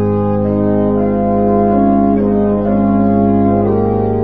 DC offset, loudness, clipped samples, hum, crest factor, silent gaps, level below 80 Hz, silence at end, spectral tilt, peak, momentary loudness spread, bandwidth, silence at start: 2%; -13 LUFS; under 0.1%; none; 12 dB; none; -32 dBFS; 0 s; -13 dB/octave; 0 dBFS; 3 LU; 3.3 kHz; 0 s